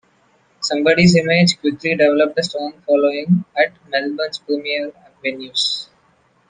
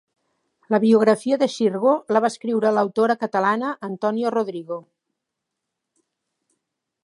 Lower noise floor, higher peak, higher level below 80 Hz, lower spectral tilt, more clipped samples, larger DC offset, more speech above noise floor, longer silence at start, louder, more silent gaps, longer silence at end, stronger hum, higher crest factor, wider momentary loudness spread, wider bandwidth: second, -58 dBFS vs -82 dBFS; about the same, 0 dBFS vs -2 dBFS; first, -52 dBFS vs -76 dBFS; about the same, -5 dB/octave vs -6 dB/octave; neither; neither; second, 41 dB vs 62 dB; about the same, 0.6 s vs 0.7 s; first, -17 LUFS vs -20 LUFS; neither; second, 0.65 s vs 2.25 s; neither; about the same, 18 dB vs 20 dB; first, 13 LU vs 10 LU; second, 9.6 kHz vs 11 kHz